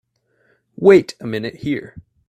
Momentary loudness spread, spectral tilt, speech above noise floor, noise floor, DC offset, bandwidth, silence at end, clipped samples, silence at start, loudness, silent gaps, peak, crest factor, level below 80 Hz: 14 LU; -7 dB/octave; 46 dB; -62 dBFS; under 0.1%; 9.4 kHz; 0.3 s; under 0.1%; 0.8 s; -17 LUFS; none; 0 dBFS; 18 dB; -56 dBFS